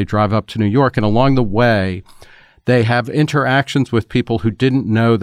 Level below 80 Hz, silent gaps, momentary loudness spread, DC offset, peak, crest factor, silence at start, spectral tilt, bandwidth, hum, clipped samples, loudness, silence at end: -36 dBFS; none; 4 LU; under 0.1%; -2 dBFS; 12 dB; 0 s; -7.5 dB/octave; 11.5 kHz; none; under 0.1%; -16 LUFS; 0 s